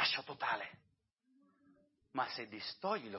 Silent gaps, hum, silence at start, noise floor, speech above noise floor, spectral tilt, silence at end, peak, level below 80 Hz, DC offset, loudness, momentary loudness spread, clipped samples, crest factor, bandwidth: none; none; 0 s; -79 dBFS; 38 dB; 0 dB/octave; 0 s; -20 dBFS; -86 dBFS; under 0.1%; -40 LUFS; 8 LU; under 0.1%; 22 dB; 5.8 kHz